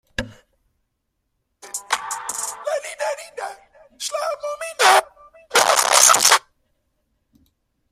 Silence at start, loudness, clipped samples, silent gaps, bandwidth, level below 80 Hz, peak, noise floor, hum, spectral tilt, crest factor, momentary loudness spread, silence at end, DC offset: 0.2 s; -17 LUFS; under 0.1%; none; 16 kHz; -54 dBFS; 0 dBFS; -74 dBFS; none; 1 dB/octave; 22 dB; 20 LU; 1.55 s; under 0.1%